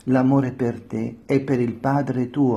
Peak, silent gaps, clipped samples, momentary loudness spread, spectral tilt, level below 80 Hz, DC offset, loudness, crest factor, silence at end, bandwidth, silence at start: -6 dBFS; none; under 0.1%; 10 LU; -9 dB/octave; -56 dBFS; under 0.1%; -22 LUFS; 14 dB; 0 s; 7.6 kHz; 0.05 s